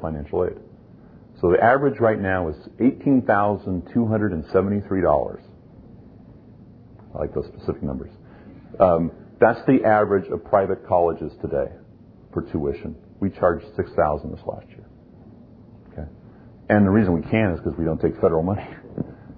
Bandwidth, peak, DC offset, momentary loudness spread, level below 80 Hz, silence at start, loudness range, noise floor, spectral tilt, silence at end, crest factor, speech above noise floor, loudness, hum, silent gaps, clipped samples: 5 kHz; -2 dBFS; under 0.1%; 16 LU; -44 dBFS; 0 s; 7 LU; -47 dBFS; -11.5 dB/octave; 0.05 s; 20 dB; 27 dB; -22 LUFS; none; none; under 0.1%